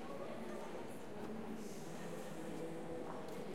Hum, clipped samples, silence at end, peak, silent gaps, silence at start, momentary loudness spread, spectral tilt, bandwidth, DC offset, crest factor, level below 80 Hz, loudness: none; under 0.1%; 0 s; -34 dBFS; none; 0 s; 2 LU; -5.5 dB/octave; 16.5 kHz; 0.3%; 14 dB; -72 dBFS; -48 LUFS